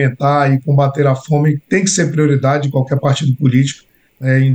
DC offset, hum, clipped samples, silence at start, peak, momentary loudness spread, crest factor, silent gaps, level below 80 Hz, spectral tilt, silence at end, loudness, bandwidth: under 0.1%; none; under 0.1%; 0 s; 0 dBFS; 3 LU; 12 dB; none; -58 dBFS; -6 dB/octave; 0 s; -14 LUFS; 9.6 kHz